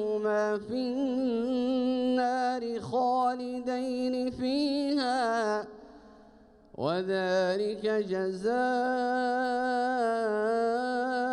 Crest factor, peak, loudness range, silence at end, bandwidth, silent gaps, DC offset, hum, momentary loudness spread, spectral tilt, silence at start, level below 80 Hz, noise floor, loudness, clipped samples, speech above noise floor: 12 dB; -16 dBFS; 2 LU; 0 s; 11 kHz; none; under 0.1%; none; 4 LU; -5.5 dB/octave; 0 s; -66 dBFS; -57 dBFS; -29 LUFS; under 0.1%; 28 dB